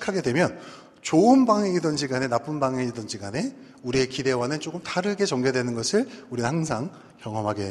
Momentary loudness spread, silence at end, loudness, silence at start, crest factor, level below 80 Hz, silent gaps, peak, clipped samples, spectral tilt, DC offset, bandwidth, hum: 14 LU; 0 s; -25 LUFS; 0 s; 18 dB; -58 dBFS; none; -6 dBFS; under 0.1%; -5 dB/octave; under 0.1%; 12 kHz; none